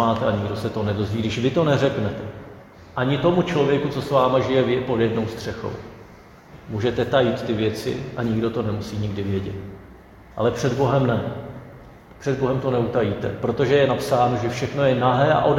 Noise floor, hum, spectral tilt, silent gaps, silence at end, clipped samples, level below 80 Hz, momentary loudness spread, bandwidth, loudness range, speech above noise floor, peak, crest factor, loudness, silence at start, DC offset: -45 dBFS; none; -7 dB/octave; none; 0 s; under 0.1%; -48 dBFS; 14 LU; 16 kHz; 4 LU; 24 dB; -4 dBFS; 18 dB; -22 LUFS; 0 s; under 0.1%